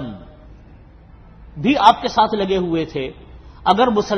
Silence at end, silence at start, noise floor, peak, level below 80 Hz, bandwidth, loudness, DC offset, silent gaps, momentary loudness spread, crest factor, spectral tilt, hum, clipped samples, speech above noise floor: 0 s; 0 s; -43 dBFS; 0 dBFS; -42 dBFS; 10 kHz; -17 LUFS; under 0.1%; none; 18 LU; 20 dB; -5.5 dB/octave; none; under 0.1%; 27 dB